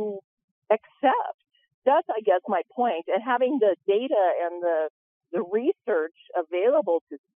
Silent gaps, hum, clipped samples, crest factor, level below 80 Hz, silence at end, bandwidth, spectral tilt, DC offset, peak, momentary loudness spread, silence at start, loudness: 0.24-0.37 s, 0.44-0.62 s, 1.34-1.39 s, 1.74-1.82 s, 4.90-5.21 s, 7.01-7.07 s; none; under 0.1%; 18 dB; -88 dBFS; 0.2 s; 3.7 kHz; -8 dB/octave; under 0.1%; -8 dBFS; 9 LU; 0 s; -25 LUFS